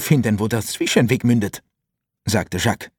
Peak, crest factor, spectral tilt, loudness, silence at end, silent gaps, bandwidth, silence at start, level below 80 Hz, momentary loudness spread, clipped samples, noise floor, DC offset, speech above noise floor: -2 dBFS; 18 dB; -5 dB/octave; -19 LUFS; 0.1 s; none; 18.5 kHz; 0 s; -50 dBFS; 10 LU; under 0.1%; -80 dBFS; under 0.1%; 61 dB